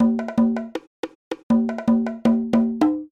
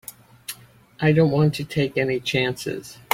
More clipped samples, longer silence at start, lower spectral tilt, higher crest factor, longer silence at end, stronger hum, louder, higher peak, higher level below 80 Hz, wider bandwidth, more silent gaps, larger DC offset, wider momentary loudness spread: neither; second, 0 s vs 0.5 s; first, -7.5 dB/octave vs -6 dB/octave; second, 16 dB vs 22 dB; second, 0.05 s vs 0.2 s; neither; about the same, -21 LUFS vs -22 LUFS; second, -4 dBFS vs 0 dBFS; about the same, -52 dBFS vs -54 dBFS; second, 7 kHz vs 16.5 kHz; first, 0.87-1.03 s, 1.15-1.31 s, 1.43-1.50 s vs none; neither; second, 15 LU vs 19 LU